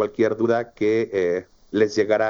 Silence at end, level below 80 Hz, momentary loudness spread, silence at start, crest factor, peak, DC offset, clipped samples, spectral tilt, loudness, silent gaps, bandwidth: 0 s; -60 dBFS; 6 LU; 0 s; 14 dB; -6 dBFS; under 0.1%; under 0.1%; -6 dB/octave; -22 LUFS; none; 7.4 kHz